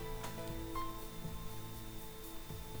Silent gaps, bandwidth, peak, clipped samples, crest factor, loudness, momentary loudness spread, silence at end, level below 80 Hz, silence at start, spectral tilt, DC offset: none; over 20 kHz; -28 dBFS; under 0.1%; 14 dB; -46 LUFS; 5 LU; 0 s; -50 dBFS; 0 s; -4.5 dB/octave; under 0.1%